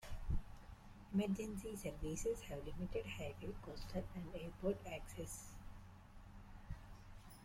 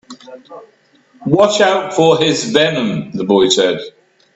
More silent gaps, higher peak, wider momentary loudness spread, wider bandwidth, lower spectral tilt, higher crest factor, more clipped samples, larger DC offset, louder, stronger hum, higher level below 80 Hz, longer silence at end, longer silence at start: neither; second, -28 dBFS vs 0 dBFS; first, 18 LU vs 10 LU; first, 16.5 kHz vs 8.4 kHz; first, -5.5 dB/octave vs -4 dB/octave; about the same, 18 dB vs 16 dB; neither; neither; second, -47 LUFS vs -13 LUFS; neither; about the same, -52 dBFS vs -56 dBFS; second, 0 s vs 0.45 s; about the same, 0 s vs 0.1 s